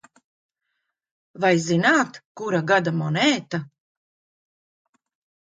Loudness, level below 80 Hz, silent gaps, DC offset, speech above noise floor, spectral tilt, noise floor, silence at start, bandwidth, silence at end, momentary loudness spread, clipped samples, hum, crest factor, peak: -21 LUFS; -70 dBFS; 2.25-2.35 s; under 0.1%; 57 dB; -5 dB/octave; -78 dBFS; 1.35 s; 9.4 kHz; 1.75 s; 12 LU; under 0.1%; none; 20 dB; -6 dBFS